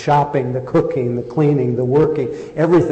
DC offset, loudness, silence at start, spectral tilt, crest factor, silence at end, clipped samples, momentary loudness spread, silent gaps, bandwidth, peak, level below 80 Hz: under 0.1%; -17 LUFS; 0 s; -9 dB/octave; 10 dB; 0 s; under 0.1%; 6 LU; none; 8.4 kHz; -6 dBFS; -48 dBFS